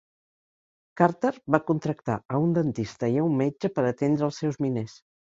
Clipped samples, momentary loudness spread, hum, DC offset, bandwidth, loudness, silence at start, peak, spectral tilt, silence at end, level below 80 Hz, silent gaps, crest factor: under 0.1%; 5 LU; none; under 0.1%; 7.8 kHz; -26 LUFS; 0.95 s; -4 dBFS; -8 dB/octave; 0.4 s; -62 dBFS; 2.25-2.29 s; 24 dB